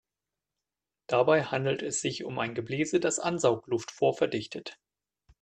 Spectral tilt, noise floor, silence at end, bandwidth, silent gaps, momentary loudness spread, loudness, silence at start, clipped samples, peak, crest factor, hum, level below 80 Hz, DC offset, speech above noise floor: -4.5 dB/octave; -89 dBFS; 0.7 s; 9.4 kHz; none; 9 LU; -29 LUFS; 1.1 s; under 0.1%; -10 dBFS; 20 dB; none; -70 dBFS; under 0.1%; 61 dB